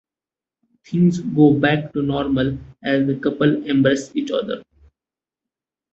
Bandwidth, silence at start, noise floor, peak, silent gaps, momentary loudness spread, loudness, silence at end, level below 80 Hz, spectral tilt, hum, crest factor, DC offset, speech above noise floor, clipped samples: 8 kHz; 0.9 s; under -90 dBFS; -2 dBFS; none; 9 LU; -19 LUFS; 1.3 s; -50 dBFS; -7 dB/octave; none; 18 dB; under 0.1%; over 72 dB; under 0.1%